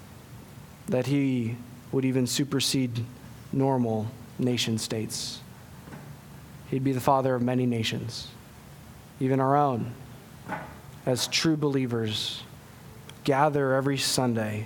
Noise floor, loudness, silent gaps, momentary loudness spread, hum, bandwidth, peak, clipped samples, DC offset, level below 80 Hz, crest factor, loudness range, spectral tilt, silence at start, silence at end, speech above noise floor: -47 dBFS; -27 LUFS; none; 22 LU; none; 19 kHz; -6 dBFS; under 0.1%; under 0.1%; -58 dBFS; 22 dB; 3 LU; -5 dB/octave; 0 s; 0 s; 21 dB